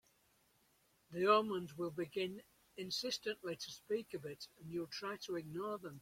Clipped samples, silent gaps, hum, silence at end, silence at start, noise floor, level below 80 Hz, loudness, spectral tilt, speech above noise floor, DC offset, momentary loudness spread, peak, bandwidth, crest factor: under 0.1%; none; none; 0 s; 1.1 s; -75 dBFS; -80 dBFS; -41 LUFS; -4 dB/octave; 34 dB; under 0.1%; 17 LU; -18 dBFS; 16.5 kHz; 24 dB